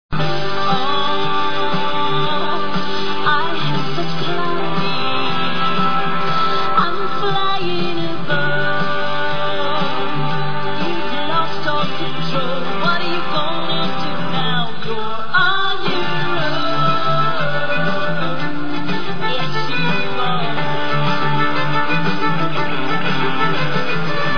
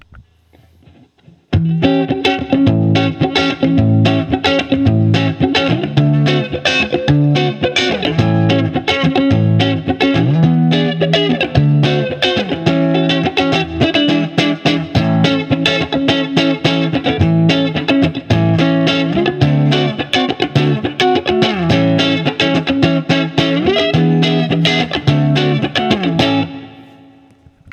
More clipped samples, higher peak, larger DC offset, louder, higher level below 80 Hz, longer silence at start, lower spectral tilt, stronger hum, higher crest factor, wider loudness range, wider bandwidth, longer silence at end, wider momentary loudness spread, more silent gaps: neither; about the same, -2 dBFS vs 0 dBFS; first, 20% vs under 0.1%; second, -19 LUFS vs -14 LUFS; about the same, -46 dBFS vs -42 dBFS; about the same, 0.1 s vs 0.15 s; about the same, -6 dB/octave vs -6.5 dB/octave; neither; about the same, 16 dB vs 14 dB; about the same, 2 LU vs 1 LU; second, 5.4 kHz vs 8.6 kHz; second, 0 s vs 0.9 s; about the same, 4 LU vs 3 LU; neither